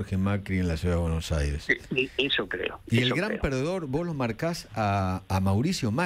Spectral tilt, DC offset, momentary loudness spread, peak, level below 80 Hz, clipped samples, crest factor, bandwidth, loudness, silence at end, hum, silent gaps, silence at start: -5.5 dB/octave; under 0.1%; 5 LU; -10 dBFS; -40 dBFS; under 0.1%; 18 dB; 15.5 kHz; -28 LUFS; 0 s; none; none; 0 s